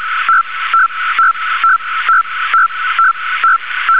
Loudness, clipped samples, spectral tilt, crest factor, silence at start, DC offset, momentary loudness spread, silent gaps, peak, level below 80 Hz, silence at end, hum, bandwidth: -12 LUFS; under 0.1%; -1.5 dB/octave; 10 dB; 0 s; 2%; 2 LU; none; -2 dBFS; -64 dBFS; 0 s; none; 4 kHz